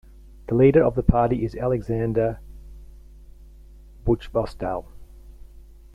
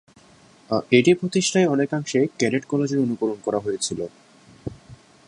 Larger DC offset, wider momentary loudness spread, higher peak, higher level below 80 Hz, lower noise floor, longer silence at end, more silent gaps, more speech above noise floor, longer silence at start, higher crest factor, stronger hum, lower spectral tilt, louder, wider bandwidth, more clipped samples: neither; second, 14 LU vs 17 LU; about the same, -2 dBFS vs -4 dBFS; first, -36 dBFS vs -58 dBFS; second, -46 dBFS vs -52 dBFS; first, 0.5 s vs 0.35 s; neither; second, 25 dB vs 31 dB; second, 0.5 s vs 0.7 s; about the same, 22 dB vs 20 dB; neither; first, -9.5 dB/octave vs -5 dB/octave; about the same, -22 LUFS vs -22 LUFS; about the same, 11 kHz vs 11.5 kHz; neither